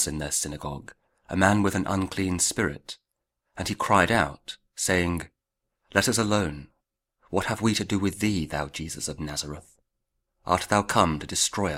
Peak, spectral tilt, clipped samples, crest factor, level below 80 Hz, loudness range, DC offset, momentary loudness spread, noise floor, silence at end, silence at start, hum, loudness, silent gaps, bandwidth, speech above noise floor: -2 dBFS; -4 dB/octave; under 0.1%; 24 dB; -48 dBFS; 4 LU; under 0.1%; 16 LU; -82 dBFS; 0 s; 0 s; none; -26 LUFS; none; 16 kHz; 57 dB